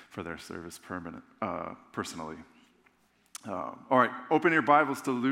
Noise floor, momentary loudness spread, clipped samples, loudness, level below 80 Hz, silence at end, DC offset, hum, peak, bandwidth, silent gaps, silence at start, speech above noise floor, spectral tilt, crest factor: -67 dBFS; 19 LU; under 0.1%; -29 LUFS; -72 dBFS; 0 s; under 0.1%; none; -8 dBFS; 16.5 kHz; none; 0 s; 37 dB; -5 dB/octave; 22 dB